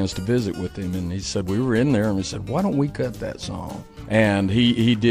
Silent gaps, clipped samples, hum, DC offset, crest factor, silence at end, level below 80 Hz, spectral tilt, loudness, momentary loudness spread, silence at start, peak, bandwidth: none; under 0.1%; none; under 0.1%; 18 dB; 0 s; -44 dBFS; -6 dB/octave; -22 LUFS; 12 LU; 0 s; -4 dBFS; 15 kHz